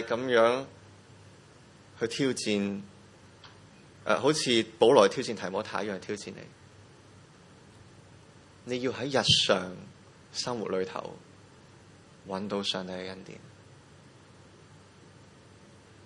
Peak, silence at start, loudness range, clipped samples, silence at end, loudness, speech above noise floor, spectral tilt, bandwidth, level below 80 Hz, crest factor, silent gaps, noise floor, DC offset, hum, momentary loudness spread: -6 dBFS; 0 s; 12 LU; under 0.1%; 2.55 s; -28 LUFS; 27 dB; -3.5 dB/octave; 11.5 kHz; -68 dBFS; 24 dB; none; -55 dBFS; under 0.1%; none; 24 LU